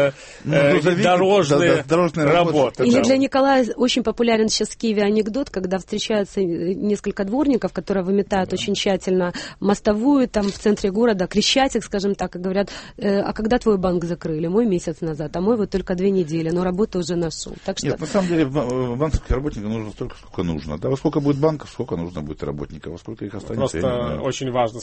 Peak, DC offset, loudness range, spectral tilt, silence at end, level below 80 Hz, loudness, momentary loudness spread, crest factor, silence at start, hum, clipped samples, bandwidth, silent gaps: -6 dBFS; under 0.1%; 7 LU; -5.5 dB/octave; 0 s; -40 dBFS; -20 LUFS; 11 LU; 14 dB; 0 s; none; under 0.1%; 8.8 kHz; none